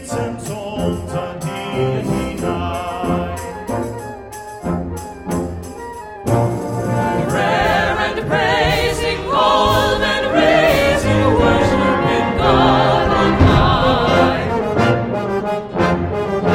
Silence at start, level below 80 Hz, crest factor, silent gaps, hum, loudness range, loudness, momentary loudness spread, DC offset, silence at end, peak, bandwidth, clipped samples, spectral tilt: 0 s; -30 dBFS; 16 dB; none; none; 10 LU; -16 LUFS; 13 LU; under 0.1%; 0 s; 0 dBFS; 16.5 kHz; under 0.1%; -6 dB/octave